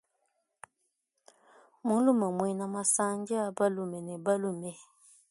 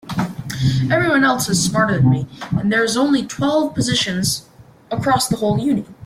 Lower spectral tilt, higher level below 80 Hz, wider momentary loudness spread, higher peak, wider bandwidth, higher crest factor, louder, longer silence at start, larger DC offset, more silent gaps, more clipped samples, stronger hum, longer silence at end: about the same, -5 dB/octave vs -4.5 dB/octave; second, -78 dBFS vs -46 dBFS; first, 11 LU vs 8 LU; second, -14 dBFS vs -4 dBFS; second, 12 kHz vs 16 kHz; about the same, 18 dB vs 14 dB; second, -30 LUFS vs -18 LUFS; first, 1.85 s vs 0.05 s; neither; neither; neither; neither; first, 0.5 s vs 0 s